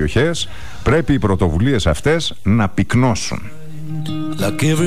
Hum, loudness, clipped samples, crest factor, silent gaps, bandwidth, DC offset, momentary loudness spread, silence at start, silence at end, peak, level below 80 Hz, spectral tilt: none; -17 LUFS; under 0.1%; 12 dB; none; 15.5 kHz; 5%; 11 LU; 0 s; 0 s; -6 dBFS; -30 dBFS; -5.5 dB/octave